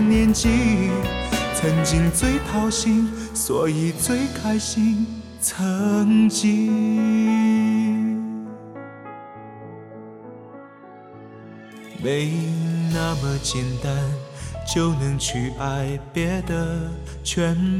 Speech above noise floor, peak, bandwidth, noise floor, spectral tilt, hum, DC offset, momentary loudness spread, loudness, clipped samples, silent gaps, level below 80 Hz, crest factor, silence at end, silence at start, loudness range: 22 dB; -8 dBFS; 16 kHz; -43 dBFS; -5 dB/octave; none; under 0.1%; 21 LU; -21 LUFS; under 0.1%; none; -36 dBFS; 14 dB; 0 s; 0 s; 11 LU